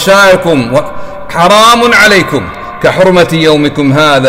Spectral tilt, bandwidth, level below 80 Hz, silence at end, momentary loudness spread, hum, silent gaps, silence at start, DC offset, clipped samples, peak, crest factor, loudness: -4.5 dB/octave; 16.5 kHz; -34 dBFS; 0 s; 12 LU; none; none; 0 s; under 0.1%; 0.3%; 0 dBFS; 6 dB; -6 LUFS